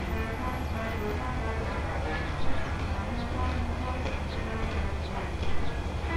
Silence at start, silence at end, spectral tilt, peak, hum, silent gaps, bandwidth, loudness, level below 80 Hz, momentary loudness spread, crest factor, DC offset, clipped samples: 0 s; 0 s; -6.5 dB/octave; -14 dBFS; none; none; 14.5 kHz; -33 LUFS; -34 dBFS; 2 LU; 14 dB; under 0.1%; under 0.1%